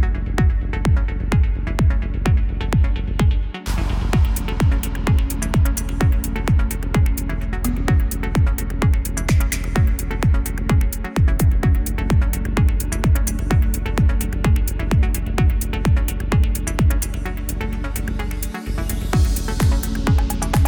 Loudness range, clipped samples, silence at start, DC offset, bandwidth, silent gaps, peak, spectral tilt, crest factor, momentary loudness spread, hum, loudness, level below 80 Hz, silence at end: 3 LU; under 0.1%; 0 s; under 0.1%; 19.5 kHz; none; -2 dBFS; -6 dB/octave; 14 dB; 5 LU; none; -20 LUFS; -20 dBFS; 0 s